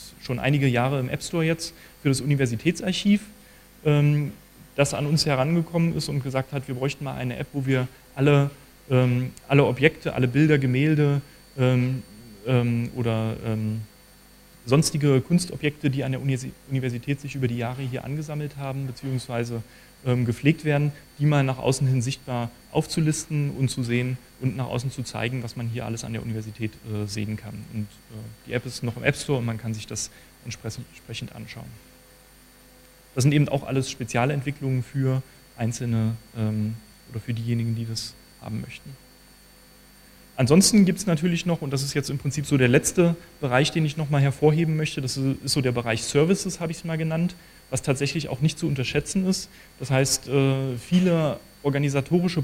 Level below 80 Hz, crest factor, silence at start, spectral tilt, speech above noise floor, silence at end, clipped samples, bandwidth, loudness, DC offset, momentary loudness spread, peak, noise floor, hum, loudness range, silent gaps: -52 dBFS; 24 dB; 0 s; -5.5 dB/octave; 28 dB; 0 s; under 0.1%; 16 kHz; -25 LUFS; under 0.1%; 13 LU; 0 dBFS; -52 dBFS; none; 8 LU; none